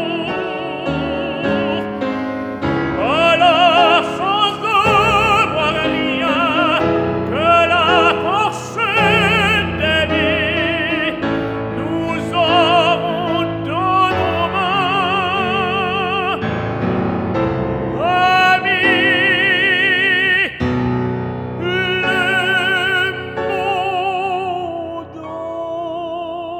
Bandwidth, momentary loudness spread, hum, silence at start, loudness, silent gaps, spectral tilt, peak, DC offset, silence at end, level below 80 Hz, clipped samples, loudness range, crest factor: 19.5 kHz; 10 LU; none; 0 s; -15 LUFS; none; -5 dB/octave; -2 dBFS; under 0.1%; 0 s; -42 dBFS; under 0.1%; 5 LU; 16 dB